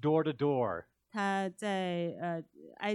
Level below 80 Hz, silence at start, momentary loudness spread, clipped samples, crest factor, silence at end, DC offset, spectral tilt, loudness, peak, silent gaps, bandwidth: -76 dBFS; 0 s; 12 LU; under 0.1%; 16 dB; 0 s; under 0.1%; -6.5 dB/octave; -34 LUFS; -18 dBFS; none; 12 kHz